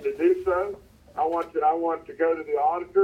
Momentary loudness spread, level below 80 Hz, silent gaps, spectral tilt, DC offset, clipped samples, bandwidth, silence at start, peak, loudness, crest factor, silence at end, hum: 8 LU; -58 dBFS; none; -7 dB/octave; under 0.1%; under 0.1%; 8.6 kHz; 0 s; -10 dBFS; -25 LUFS; 14 dB; 0 s; none